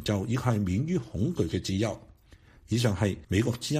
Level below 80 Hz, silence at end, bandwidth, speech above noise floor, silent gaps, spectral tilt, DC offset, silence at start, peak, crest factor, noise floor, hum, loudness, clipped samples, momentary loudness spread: -50 dBFS; 0 s; 15 kHz; 28 dB; none; -6 dB/octave; under 0.1%; 0 s; -12 dBFS; 16 dB; -56 dBFS; none; -29 LUFS; under 0.1%; 4 LU